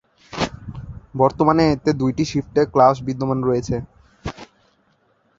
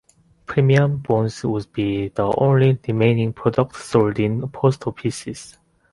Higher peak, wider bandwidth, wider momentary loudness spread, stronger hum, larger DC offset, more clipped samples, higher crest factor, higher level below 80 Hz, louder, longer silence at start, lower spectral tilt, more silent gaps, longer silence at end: about the same, 0 dBFS vs -2 dBFS; second, 7.8 kHz vs 11.5 kHz; first, 19 LU vs 9 LU; neither; neither; neither; about the same, 20 dB vs 18 dB; first, -44 dBFS vs -50 dBFS; about the same, -19 LUFS vs -20 LUFS; second, 0.3 s vs 0.5 s; about the same, -7 dB/octave vs -7.5 dB/octave; neither; first, 0.95 s vs 0.4 s